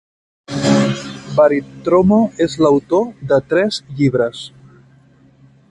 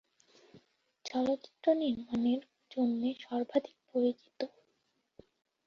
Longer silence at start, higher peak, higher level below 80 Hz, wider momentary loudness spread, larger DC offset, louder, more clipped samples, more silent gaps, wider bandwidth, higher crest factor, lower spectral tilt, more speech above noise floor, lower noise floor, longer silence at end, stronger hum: about the same, 0.5 s vs 0.55 s; first, 0 dBFS vs -16 dBFS; first, -48 dBFS vs -76 dBFS; second, 8 LU vs 11 LU; neither; first, -16 LUFS vs -34 LUFS; neither; neither; first, 11.5 kHz vs 7 kHz; about the same, 16 dB vs 20 dB; about the same, -6.5 dB/octave vs -6 dB/octave; second, 34 dB vs 46 dB; second, -49 dBFS vs -78 dBFS; about the same, 1.25 s vs 1.2 s; neither